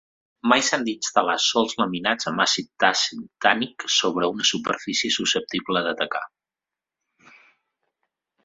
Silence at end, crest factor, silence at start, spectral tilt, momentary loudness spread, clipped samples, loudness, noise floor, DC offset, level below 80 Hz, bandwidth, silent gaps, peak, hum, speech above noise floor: 2.2 s; 24 dB; 0.45 s; -2 dB/octave; 6 LU; under 0.1%; -22 LUFS; -89 dBFS; under 0.1%; -66 dBFS; 8 kHz; none; -2 dBFS; none; 66 dB